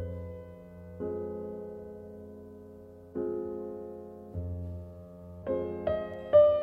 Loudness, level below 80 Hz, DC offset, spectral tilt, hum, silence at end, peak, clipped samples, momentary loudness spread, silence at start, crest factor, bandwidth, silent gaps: -33 LUFS; -56 dBFS; under 0.1%; -9.5 dB/octave; none; 0 s; -10 dBFS; under 0.1%; 16 LU; 0 s; 22 dB; 4.1 kHz; none